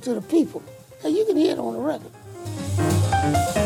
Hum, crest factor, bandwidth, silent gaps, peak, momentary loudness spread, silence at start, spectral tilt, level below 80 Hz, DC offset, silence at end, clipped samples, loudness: none; 14 dB; 18 kHz; none; -8 dBFS; 14 LU; 0 s; -6 dB/octave; -46 dBFS; under 0.1%; 0 s; under 0.1%; -23 LUFS